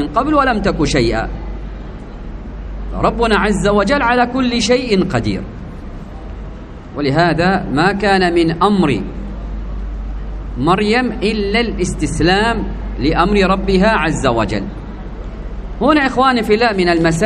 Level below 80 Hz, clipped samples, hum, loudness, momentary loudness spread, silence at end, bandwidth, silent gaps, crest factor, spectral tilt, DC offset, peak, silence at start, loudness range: -26 dBFS; under 0.1%; none; -14 LUFS; 17 LU; 0 s; 11.5 kHz; none; 16 dB; -5.5 dB/octave; under 0.1%; 0 dBFS; 0 s; 3 LU